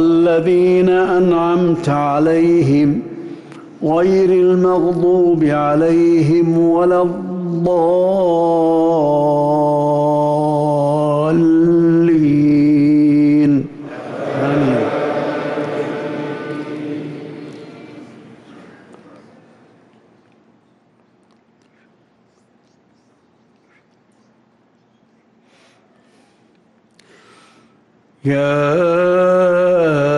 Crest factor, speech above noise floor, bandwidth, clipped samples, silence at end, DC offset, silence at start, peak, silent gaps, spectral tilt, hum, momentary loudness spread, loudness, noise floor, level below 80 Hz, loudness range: 10 dB; 43 dB; 10.5 kHz; under 0.1%; 0 s; under 0.1%; 0 s; -6 dBFS; none; -8.5 dB/octave; none; 13 LU; -14 LUFS; -56 dBFS; -54 dBFS; 12 LU